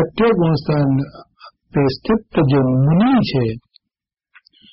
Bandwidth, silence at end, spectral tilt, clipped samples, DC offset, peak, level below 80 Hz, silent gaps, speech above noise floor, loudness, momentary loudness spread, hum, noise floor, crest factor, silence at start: 5.8 kHz; 1.15 s; -7 dB/octave; under 0.1%; under 0.1%; -6 dBFS; -44 dBFS; none; 67 dB; -17 LUFS; 9 LU; none; -82 dBFS; 10 dB; 0 s